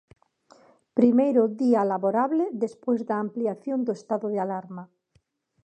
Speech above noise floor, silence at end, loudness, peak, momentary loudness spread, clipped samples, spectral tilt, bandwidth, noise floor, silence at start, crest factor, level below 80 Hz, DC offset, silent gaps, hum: 44 dB; 0.8 s; -25 LUFS; -6 dBFS; 10 LU; under 0.1%; -8.5 dB/octave; 8.6 kHz; -68 dBFS; 0.95 s; 18 dB; -76 dBFS; under 0.1%; none; none